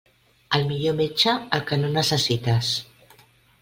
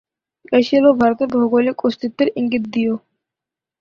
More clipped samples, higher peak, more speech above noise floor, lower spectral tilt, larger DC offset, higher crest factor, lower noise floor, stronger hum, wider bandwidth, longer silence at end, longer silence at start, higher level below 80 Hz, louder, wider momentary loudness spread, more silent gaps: neither; about the same, -4 dBFS vs -2 dBFS; second, 33 dB vs 70 dB; second, -4.5 dB/octave vs -6.5 dB/octave; neither; first, 22 dB vs 16 dB; second, -55 dBFS vs -86 dBFS; neither; first, 16.5 kHz vs 6.8 kHz; about the same, 0.75 s vs 0.85 s; about the same, 0.5 s vs 0.5 s; about the same, -56 dBFS vs -58 dBFS; second, -22 LUFS vs -17 LUFS; second, 5 LU vs 8 LU; neither